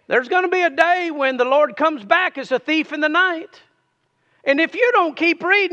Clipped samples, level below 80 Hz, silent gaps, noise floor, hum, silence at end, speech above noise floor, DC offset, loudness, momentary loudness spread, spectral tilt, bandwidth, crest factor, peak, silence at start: under 0.1%; -74 dBFS; none; -67 dBFS; none; 0 s; 49 dB; under 0.1%; -18 LUFS; 5 LU; -3.5 dB/octave; 9 kHz; 18 dB; 0 dBFS; 0.1 s